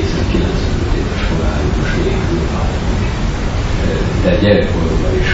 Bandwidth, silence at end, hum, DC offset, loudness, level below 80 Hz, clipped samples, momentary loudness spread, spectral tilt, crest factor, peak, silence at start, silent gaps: 8 kHz; 0 s; none; 0.1%; -16 LUFS; -18 dBFS; under 0.1%; 5 LU; -6.5 dB/octave; 14 dB; 0 dBFS; 0 s; none